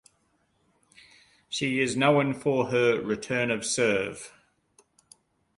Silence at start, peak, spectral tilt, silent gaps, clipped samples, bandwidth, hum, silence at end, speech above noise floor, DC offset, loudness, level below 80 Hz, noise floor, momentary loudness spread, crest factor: 1.5 s; -8 dBFS; -4.5 dB/octave; none; under 0.1%; 11.5 kHz; none; 1.3 s; 45 dB; under 0.1%; -26 LUFS; -66 dBFS; -70 dBFS; 13 LU; 20 dB